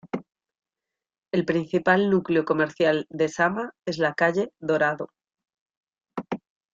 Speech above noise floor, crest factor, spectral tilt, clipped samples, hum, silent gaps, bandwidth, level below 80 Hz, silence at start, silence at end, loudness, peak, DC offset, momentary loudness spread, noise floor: 65 dB; 20 dB; -6 dB/octave; under 0.1%; none; 5.61-5.66 s, 5.77-5.81 s; 7.8 kHz; -66 dBFS; 0.05 s; 0.35 s; -24 LUFS; -6 dBFS; under 0.1%; 15 LU; -88 dBFS